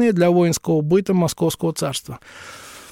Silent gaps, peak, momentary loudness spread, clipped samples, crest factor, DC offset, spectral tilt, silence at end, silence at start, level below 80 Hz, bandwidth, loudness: none; -6 dBFS; 21 LU; under 0.1%; 12 dB; under 0.1%; -6 dB/octave; 0.05 s; 0 s; -54 dBFS; 16.5 kHz; -19 LUFS